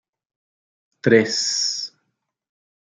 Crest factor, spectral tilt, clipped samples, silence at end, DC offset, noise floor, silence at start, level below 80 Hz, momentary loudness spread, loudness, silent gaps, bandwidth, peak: 22 dB; -3 dB/octave; under 0.1%; 0.95 s; under 0.1%; -76 dBFS; 1.05 s; -70 dBFS; 12 LU; -19 LUFS; none; 10 kHz; -2 dBFS